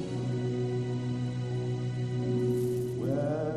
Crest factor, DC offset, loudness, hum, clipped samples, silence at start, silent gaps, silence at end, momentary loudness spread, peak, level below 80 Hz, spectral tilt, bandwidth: 12 dB; under 0.1%; -32 LUFS; none; under 0.1%; 0 s; none; 0 s; 4 LU; -18 dBFS; -58 dBFS; -8 dB/octave; 13 kHz